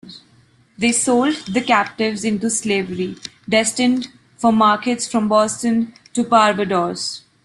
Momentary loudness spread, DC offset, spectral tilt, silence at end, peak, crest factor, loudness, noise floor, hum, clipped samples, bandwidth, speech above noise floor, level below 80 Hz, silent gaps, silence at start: 10 LU; under 0.1%; -3.5 dB/octave; 0.25 s; -2 dBFS; 18 dB; -18 LUFS; -54 dBFS; none; under 0.1%; 12.5 kHz; 36 dB; -58 dBFS; none; 0.05 s